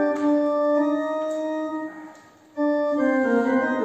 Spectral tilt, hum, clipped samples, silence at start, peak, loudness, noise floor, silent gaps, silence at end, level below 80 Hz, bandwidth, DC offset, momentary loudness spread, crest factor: -6 dB/octave; none; under 0.1%; 0 s; -10 dBFS; -23 LUFS; -48 dBFS; none; 0 s; -68 dBFS; 8.4 kHz; under 0.1%; 11 LU; 14 dB